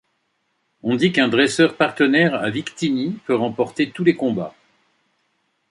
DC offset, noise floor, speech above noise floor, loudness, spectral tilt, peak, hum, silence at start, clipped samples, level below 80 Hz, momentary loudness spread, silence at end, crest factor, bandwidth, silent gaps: under 0.1%; -70 dBFS; 51 dB; -19 LUFS; -5.5 dB/octave; -2 dBFS; none; 0.85 s; under 0.1%; -64 dBFS; 8 LU; 1.2 s; 18 dB; 11.5 kHz; none